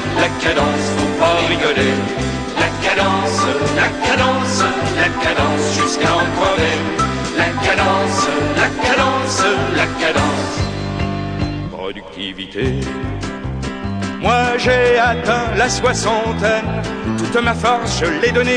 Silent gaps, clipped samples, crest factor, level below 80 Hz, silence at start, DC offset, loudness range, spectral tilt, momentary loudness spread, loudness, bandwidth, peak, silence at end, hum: none; under 0.1%; 16 dB; -34 dBFS; 0 s; under 0.1%; 5 LU; -4.5 dB/octave; 9 LU; -16 LUFS; 10 kHz; 0 dBFS; 0 s; none